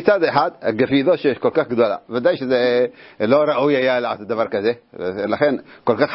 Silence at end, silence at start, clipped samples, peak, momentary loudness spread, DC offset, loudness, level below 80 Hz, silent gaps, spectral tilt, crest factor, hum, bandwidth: 0 s; 0 s; under 0.1%; 0 dBFS; 7 LU; under 0.1%; -19 LUFS; -60 dBFS; none; -10 dB/octave; 18 dB; none; 5.8 kHz